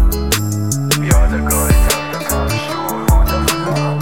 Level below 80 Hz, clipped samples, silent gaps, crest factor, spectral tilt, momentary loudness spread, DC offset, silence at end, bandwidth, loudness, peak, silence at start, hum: -16 dBFS; under 0.1%; none; 14 dB; -4.5 dB/octave; 5 LU; 1%; 0 s; 17.5 kHz; -15 LUFS; 0 dBFS; 0 s; none